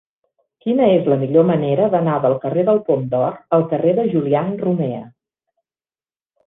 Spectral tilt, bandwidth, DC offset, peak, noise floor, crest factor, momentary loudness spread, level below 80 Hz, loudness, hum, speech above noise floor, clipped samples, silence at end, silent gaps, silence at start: -11.5 dB/octave; 3.9 kHz; under 0.1%; -2 dBFS; under -90 dBFS; 16 dB; 6 LU; -58 dBFS; -17 LUFS; none; over 74 dB; under 0.1%; 1.4 s; none; 0.65 s